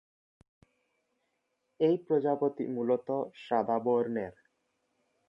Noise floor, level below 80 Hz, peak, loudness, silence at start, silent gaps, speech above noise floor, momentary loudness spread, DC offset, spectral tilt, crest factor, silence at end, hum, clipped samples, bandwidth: -80 dBFS; -76 dBFS; -16 dBFS; -31 LUFS; 1.8 s; none; 50 dB; 7 LU; under 0.1%; -9 dB/octave; 18 dB; 1 s; none; under 0.1%; 5.6 kHz